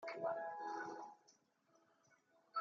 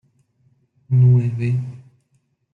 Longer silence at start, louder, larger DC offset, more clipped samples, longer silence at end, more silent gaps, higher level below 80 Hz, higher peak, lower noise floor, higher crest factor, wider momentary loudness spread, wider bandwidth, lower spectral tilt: second, 0 s vs 0.9 s; second, -47 LUFS vs -18 LUFS; neither; neither; second, 0 s vs 0.75 s; neither; second, under -90 dBFS vs -60 dBFS; second, -30 dBFS vs -6 dBFS; first, -77 dBFS vs -66 dBFS; first, 20 dB vs 14 dB; first, 14 LU vs 11 LU; first, 7.4 kHz vs 2.9 kHz; second, -2.5 dB/octave vs -10.5 dB/octave